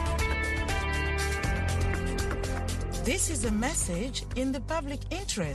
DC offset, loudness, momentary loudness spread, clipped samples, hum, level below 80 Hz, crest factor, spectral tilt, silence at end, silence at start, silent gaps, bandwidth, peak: under 0.1%; -30 LUFS; 5 LU; under 0.1%; none; -34 dBFS; 16 dB; -4 dB/octave; 0 s; 0 s; none; 12.5 kHz; -14 dBFS